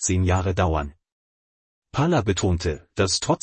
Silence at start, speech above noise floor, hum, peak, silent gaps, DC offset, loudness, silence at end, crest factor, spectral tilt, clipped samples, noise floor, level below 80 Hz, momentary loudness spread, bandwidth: 0 s; over 68 dB; none; -8 dBFS; 1.12-1.82 s; under 0.1%; -23 LUFS; 0.05 s; 16 dB; -5 dB/octave; under 0.1%; under -90 dBFS; -40 dBFS; 7 LU; 8.8 kHz